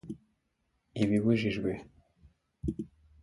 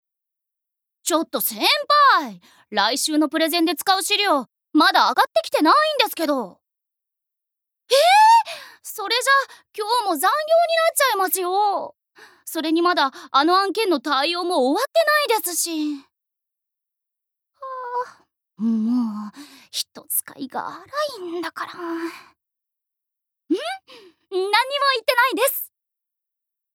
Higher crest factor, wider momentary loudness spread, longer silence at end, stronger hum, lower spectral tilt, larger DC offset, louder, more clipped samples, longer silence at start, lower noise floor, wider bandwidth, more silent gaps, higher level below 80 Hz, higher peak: about the same, 20 dB vs 20 dB; first, 20 LU vs 15 LU; second, 0.35 s vs 1.1 s; neither; first, -7.5 dB/octave vs -1.5 dB/octave; neither; second, -32 LUFS vs -19 LUFS; neither; second, 0.05 s vs 1.05 s; second, -78 dBFS vs -84 dBFS; second, 11.5 kHz vs over 20 kHz; neither; first, -52 dBFS vs -84 dBFS; second, -14 dBFS vs 0 dBFS